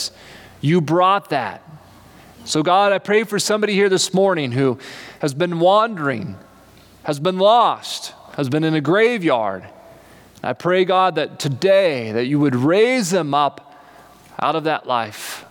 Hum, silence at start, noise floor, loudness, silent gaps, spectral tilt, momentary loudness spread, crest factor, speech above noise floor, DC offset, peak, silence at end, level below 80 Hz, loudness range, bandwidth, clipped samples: none; 0 s; -47 dBFS; -18 LUFS; none; -5 dB/octave; 13 LU; 14 dB; 29 dB; under 0.1%; -4 dBFS; 0.05 s; -64 dBFS; 2 LU; 19 kHz; under 0.1%